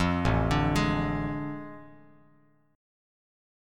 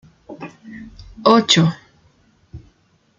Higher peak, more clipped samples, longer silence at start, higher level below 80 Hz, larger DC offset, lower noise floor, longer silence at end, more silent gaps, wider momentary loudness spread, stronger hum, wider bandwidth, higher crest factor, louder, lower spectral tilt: second, -12 dBFS vs 0 dBFS; neither; second, 0 s vs 0.3 s; first, -40 dBFS vs -50 dBFS; neither; first, -64 dBFS vs -59 dBFS; first, 1.8 s vs 0.6 s; neither; second, 17 LU vs 26 LU; neither; first, 14.5 kHz vs 9.6 kHz; about the same, 18 dB vs 20 dB; second, -28 LUFS vs -15 LUFS; first, -6.5 dB/octave vs -4.5 dB/octave